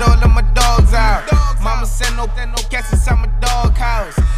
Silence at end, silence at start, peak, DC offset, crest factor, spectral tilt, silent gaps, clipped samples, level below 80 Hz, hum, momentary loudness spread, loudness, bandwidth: 0 s; 0 s; -2 dBFS; under 0.1%; 10 dB; -4.5 dB/octave; none; under 0.1%; -14 dBFS; none; 8 LU; -16 LUFS; 14.5 kHz